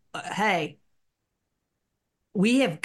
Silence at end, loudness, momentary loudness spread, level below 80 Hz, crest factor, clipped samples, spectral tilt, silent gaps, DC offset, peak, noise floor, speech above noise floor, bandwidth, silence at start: 0.05 s; -25 LUFS; 13 LU; -74 dBFS; 18 dB; under 0.1%; -5 dB/octave; none; under 0.1%; -10 dBFS; -80 dBFS; 55 dB; 12.5 kHz; 0.15 s